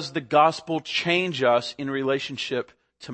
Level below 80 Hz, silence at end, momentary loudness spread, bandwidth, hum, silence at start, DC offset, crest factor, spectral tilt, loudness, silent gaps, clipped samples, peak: -70 dBFS; 0 s; 10 LU; 8.8 kHz; none; 0 s; under 0.1%; 20 dB; -4.5 dB/octave; -24 LUFS; none; under 0.1%; -6 dBFS